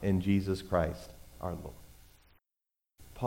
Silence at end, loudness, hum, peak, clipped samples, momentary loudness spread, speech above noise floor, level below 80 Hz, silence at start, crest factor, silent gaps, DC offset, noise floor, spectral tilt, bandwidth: 0 s; -33 LUFS; none; -16 dBFS; under 0.1%; 21 LU; 58 dB; -50 dBFS; 0 s; 20 dB; none; under 0.1%; -89 dBFS; -7.5 dB/octave; 17 kHz